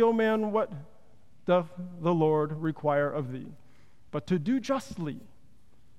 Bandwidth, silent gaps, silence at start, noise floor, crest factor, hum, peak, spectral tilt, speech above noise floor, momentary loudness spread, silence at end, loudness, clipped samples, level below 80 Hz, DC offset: 12 kHz; none; 0 s; -63 dBFS; 16 dB; none; -12 dBFS; -7.5 dB/octave; 35 dB; 14 LU; 0.8 s; -29 LUFS; under 0.1%; -64 dBFS; 0.4%